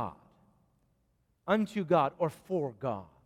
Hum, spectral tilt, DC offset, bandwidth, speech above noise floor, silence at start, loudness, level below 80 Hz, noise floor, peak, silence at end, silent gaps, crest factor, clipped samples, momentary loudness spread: none; -7.5 dB/octave; under 0.1%; 15 kHz; 43 dB; 0 s; -32 LUFS; -70 dBFS; -74 dBFS; -14 dBFS; 0.2 s; none; 20 dB; under 0.1%; 10 LU